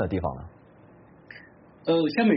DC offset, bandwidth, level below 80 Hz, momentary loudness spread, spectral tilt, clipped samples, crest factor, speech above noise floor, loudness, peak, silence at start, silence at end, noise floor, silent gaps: under 0.1%; 5.8 kHz; -50 dBFS; 24 LU; -5.5 dB/octave; under 0.1%; 16 dB; 29 dB; -26 LUFS; -12 dBFS; 0 s; 0 s; -53 dBFS; none